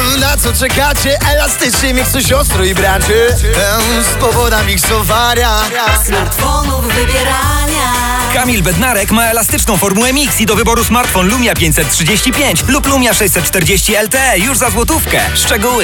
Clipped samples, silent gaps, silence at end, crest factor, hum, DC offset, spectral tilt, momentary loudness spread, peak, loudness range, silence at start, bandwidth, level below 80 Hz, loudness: under 0.1%; none; 0 s; 10 dB; none; under 0.1%; -3 dB/octave; 2 LU; 0 dBFS; 2 LU; 0 s; over 20 kHz; -20 dBFS; -10 LUFS